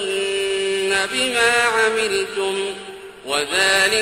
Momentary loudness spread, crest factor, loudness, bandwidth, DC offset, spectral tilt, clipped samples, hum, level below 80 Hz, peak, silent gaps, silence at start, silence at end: 11 LU; 18 dB; -18 LUFS; 16 kHz; under 0.1%; -1 dB/octave; under 0.1%; none; -54 dBFS; -2 dBFS; none; 0 s; 0 s